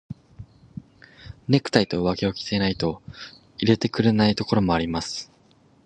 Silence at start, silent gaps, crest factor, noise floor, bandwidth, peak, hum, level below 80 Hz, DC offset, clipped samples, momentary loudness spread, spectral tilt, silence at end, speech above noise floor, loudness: 0.1 s; none; 24 dB; -57 dBFS; 9.8 kHz; 0 dBFS; none; -48 dBFS; under 0.1%; under 0.1%; 22 LU; -6 dB/octave; 0.6 s; 35 dB; -23 LUFS